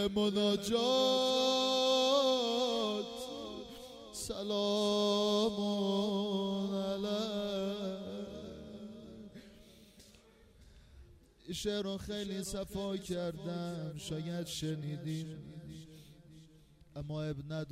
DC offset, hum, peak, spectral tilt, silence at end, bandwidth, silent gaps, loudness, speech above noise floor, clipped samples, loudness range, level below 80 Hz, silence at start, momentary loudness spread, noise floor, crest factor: under 0.1%; none; -20 dBFS; -4.5 dB/octave; 0 s; 16 kHz; none; -34 LUFS; 27 dB; under 0.1%; 13 LU; -62 dBFS; 0 s; 19 LU; -62 dBFS; 16 dB